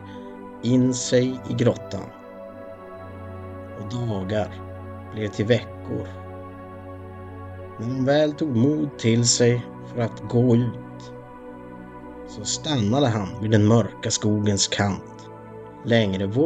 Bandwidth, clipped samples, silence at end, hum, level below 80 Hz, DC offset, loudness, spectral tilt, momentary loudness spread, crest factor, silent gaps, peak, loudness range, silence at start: 9.4 kHz; under 0.1%; 0 s; none; -54 dBFS; under 0.1%; -22 LUFS; -5 dB/octave; 20 LU; 20 dB; none; -4 dBFS; 8 LU; 0 s